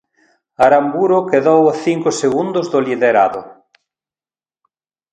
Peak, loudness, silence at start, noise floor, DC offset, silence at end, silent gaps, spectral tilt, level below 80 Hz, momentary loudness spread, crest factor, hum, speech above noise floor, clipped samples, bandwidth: 0 dBFS; -14 LUFS; 0.6 s; under -90 dBFS; under 0.1%; 1.6 s; none; -5.5 dB/octave; -60 dBFS; 6 LU; 16 dB; none; over 76 dB; under 0.1%; 9.6 kHz